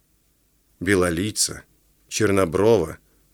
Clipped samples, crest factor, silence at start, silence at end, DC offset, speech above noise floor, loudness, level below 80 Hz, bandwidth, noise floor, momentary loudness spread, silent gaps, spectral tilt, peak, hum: under 0.1%; 18 dB; 0.8 s; 0.4 s; under 0.1%; 43 dB; -21 LUFS; -52 dBFS; 19.5 kHz; -63 dBFS; 11 LU; none; -4 dB/octave; -4 dBFS; none